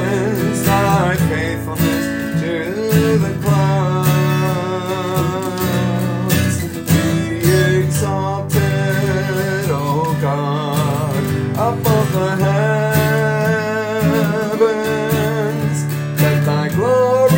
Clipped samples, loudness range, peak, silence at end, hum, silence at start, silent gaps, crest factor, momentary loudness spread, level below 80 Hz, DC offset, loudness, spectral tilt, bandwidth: under 0.1%; 1 LU; -2 dBFS; 0 s; none; 0 s; none; 14 dB; 5 LU; -46 dBFS; under 0.1%; -17 LUFS; -6 dB/octave; 17 kHz